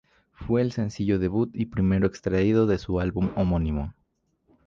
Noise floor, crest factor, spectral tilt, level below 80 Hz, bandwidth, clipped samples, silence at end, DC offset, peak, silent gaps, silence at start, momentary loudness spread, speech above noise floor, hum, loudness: -70 dBFS; 16 dB; -8.5 dB/octave; -40 dBFS; 7.4 kHz; under 0.1%; 0.75 s; under 0.1%; -10 dBFS; none; 0.4 s; 6 LU; 46 dB; none; -25 LUFS